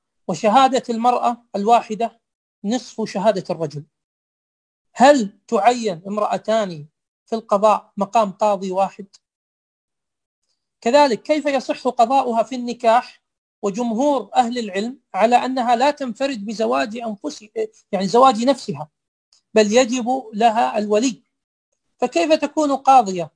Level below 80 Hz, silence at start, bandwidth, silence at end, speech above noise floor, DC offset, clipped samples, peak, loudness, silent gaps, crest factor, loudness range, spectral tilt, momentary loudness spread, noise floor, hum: -68 dBFS; 0.3 s; 10.5 kHz; 0.1 s; over 72 dB; under 0.1%; under 0.1%; -2 dBFS; -19 LUFS; 2.35-2.62 s, 4.04-4.85 s, 7.08-7.26 s, 9.35-9.88 s, 10.26-10.42 s, 13.38-13.62 s, 19.08-19.32 s, 21.44-21.72 s; 18 dB; 3 LU; -4.5 dB/octave; 13 LU; under -90 dBFS; none